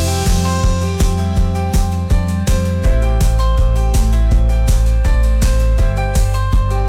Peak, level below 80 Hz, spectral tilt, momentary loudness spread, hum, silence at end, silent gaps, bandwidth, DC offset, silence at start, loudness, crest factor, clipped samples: -4 dBFS; -14 dBFS; -6 dB/octave; 2 LU; none; 0 s; none; 15.5 kHz; under 0.1%; 0 s; -16 LUFS; 8 dB; under 0.1%